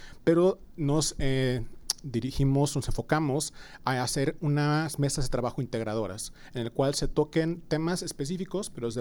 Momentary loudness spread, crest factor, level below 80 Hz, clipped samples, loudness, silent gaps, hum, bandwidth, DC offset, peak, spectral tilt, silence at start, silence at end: 8 LU; 22 dB; -42 dBFS; under 0.1%; -29 LUFS; none; none; 18 kHz; under 0.1%; -6 dBFS; -5.5 dB/octave; 0 s; 0 s